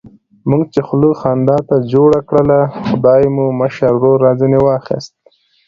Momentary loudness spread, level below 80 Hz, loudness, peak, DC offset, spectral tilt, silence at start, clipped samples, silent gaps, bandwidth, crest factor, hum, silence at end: 6 LU; -44 dBFS; -12 LUFS; 0 dBFS; under 0.1%; -9 dB/octave; 0.45 s; under 0.1%; none; 7.4 kHz; 12 dB; none; 0.6 s